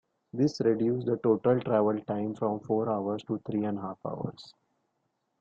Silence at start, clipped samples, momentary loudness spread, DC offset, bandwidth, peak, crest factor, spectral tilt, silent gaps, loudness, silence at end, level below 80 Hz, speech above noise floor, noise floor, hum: 0.35 s; under 0.1%; 11 LU; under 0.1%; 7.8 kHz; -12 dBFS; 18 dB; -8 dB/octave; none; -29 LUFS; 0.95 s; -70 dBFS; 50 dB; -78 dBFS; none